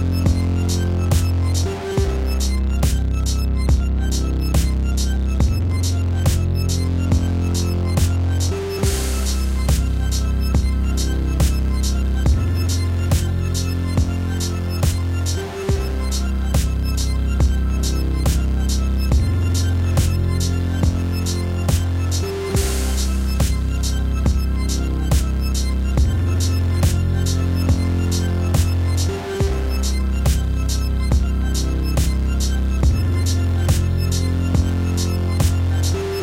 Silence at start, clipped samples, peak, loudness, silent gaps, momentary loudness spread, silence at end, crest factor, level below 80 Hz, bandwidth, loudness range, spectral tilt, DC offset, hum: 0 s; under 0.1%; -4 dBFS; -20 LUFS; none; 3 LU; 0 s; 14 dB; -22 dBFS; 16.5 kHz; 1 LU; -5.5 dB/octave; under 0.1%; none